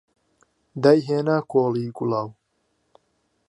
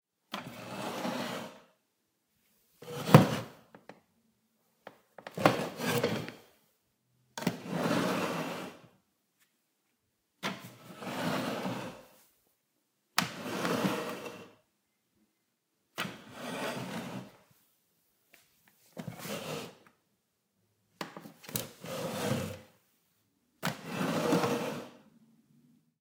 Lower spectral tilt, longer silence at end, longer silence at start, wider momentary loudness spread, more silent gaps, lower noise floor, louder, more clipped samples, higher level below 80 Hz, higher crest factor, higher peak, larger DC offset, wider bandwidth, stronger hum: first, -8 dB/octave vs -5 dB/octave; about the same, 1.15 s vs 1.05 s; first, 0.75 s vs 0.3 s; second, 12 LU vs 18 LU; neither; second, -71 dBFS vs -79 dBFS; first, -22 LUFS vs -33 LUFS; neither; about the same, -70 dBFS vs -72 dBFS; second, 22 dB vs 36 dB; about the same, -2 dBFS vs 0 dBFS; neither; second, 11 kHz vs 16 kHz; neither